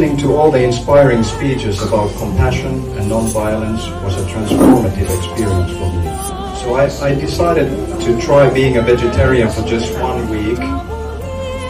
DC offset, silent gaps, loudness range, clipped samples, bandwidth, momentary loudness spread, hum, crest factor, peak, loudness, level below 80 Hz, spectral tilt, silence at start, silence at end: under 0.1%; none; 3 LU; under 0.1%; 15.5 kHz; 10 LU; none; 14 dB; 0 dBFS; -15 LUFS; -26 dBFS; -6.5 dB/octave; 0 s; 0 s